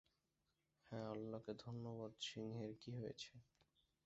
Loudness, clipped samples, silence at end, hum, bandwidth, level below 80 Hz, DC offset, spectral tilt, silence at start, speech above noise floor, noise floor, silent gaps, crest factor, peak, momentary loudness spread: -52 LUFS; under 0.1%; 0.6 s; none; 8 kHz; -80 dBFS; under 0.1%; -5.5 dB/octave; 0.85 s; 37 dB; -88 dBFS; none; 18 dB; -36 dBFS; 6 LU